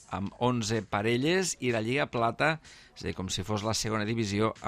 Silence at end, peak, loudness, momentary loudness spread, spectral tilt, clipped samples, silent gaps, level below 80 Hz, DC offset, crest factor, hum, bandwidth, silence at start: 0 s; -12 dBFS; -30 LUFS; 10 LU; -4.5 dB/octave; under 0.1%; none; -56 dBFS; under 0.1%; 18 dB; none; 15 kHz; 0 s